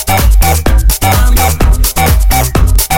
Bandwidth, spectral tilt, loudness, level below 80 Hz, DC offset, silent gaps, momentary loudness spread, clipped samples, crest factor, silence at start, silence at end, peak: 17.5 kHz; -4 dB/octave; -10 LUFS; -10 dBFS; under 0.1%; none; 1 LU; 0.4%; 8 dB; 0 s; 0 s; 0 dBFS